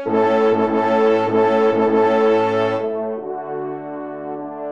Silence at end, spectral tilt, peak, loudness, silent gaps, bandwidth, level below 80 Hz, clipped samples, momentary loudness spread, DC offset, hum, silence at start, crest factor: 0 s; -7 dB/octave; -4 dBFS; -17 LUFS; none; 7.4 kHz; -68 dBFS; under 0.1%; 13 LU; 0.3%; none; 0 s; 12 dB